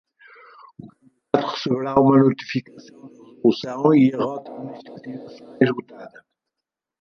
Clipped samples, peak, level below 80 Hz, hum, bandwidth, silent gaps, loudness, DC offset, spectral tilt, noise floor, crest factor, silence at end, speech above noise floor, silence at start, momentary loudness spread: under 0.1%; -2 dBFS; -62 dBFS; none; 6.8 kHz; none; -20 LUFS; under 0.1%; -7.5 dB/octave; -85 dBFS; 20 dB; 0.95 s; 65 dB; 0.8 s; 21 LU